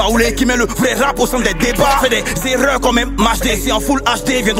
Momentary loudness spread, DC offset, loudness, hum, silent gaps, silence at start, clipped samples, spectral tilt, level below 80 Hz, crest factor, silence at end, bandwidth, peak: 3 LU; under 0.1%; -14 LUFS; none; none; 0 s; under 0.1%; -3.5 dB/octave; -26 dBFS; 14 dB; 0 s; 16.5 kHz; 0 dBFS